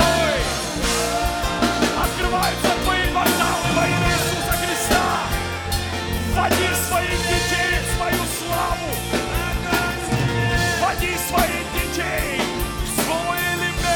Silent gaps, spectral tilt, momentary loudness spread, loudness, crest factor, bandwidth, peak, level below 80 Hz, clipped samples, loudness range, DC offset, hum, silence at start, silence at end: none; -3.5 dB/octave; 5 LU; -20 LUFS; 14 dB; over 20 kHz; -6 dBFS; -30 dBFS; under 0.1%; 2 LU; under 0.1%; none; 0 s; 0 s